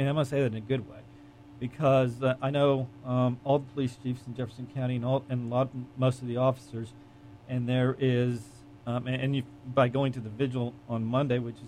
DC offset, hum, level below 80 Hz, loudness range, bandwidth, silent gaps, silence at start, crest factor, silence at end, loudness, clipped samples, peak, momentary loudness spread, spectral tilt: under 0.1%; none; -62 dBFS; 3 LU; 10.5 kHz; none; 0 s; 16 dB; 0 s; -29 LUFS; under 0.1%; -12 dBFS; 12 LU; -8 dB/octave